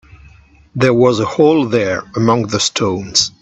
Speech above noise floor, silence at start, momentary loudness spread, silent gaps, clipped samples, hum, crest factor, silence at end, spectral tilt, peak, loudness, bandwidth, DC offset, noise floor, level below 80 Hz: 31 dB; 0.75 s; 5 LU; none; under 0.1%; none; 14 dB; 0.1 s; -4.5 dB/octave; 0 dBFS; -14 LUFS; 8.6 kHz; under 0.1%; -44 dBFS; -48 dBFS